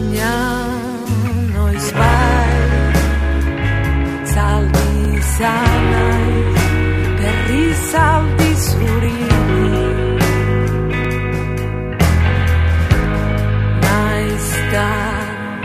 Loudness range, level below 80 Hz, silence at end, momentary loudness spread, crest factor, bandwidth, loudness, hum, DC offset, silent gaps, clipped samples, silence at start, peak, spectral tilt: 2 LU; -20 dBFS; 0 s; 5 LU; 14 dB; 15.5 kHz; -16 LUFS; none; under 0.1%; none; under 0.1%; 0 s; 0 dBFS; -6 dB/octave